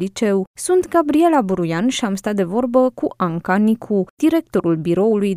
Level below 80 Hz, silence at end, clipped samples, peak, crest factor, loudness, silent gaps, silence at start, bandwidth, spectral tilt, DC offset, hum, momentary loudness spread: -54 dBFS; 0 s; under 0.1%; -2 dBFS; 14 dB; -18 LUFS; 0.47-0.54 s, 4.10-4.17 s; 0 s; 15.5 kHz; -6 dB/octave; under 0.1%; none; 6 LU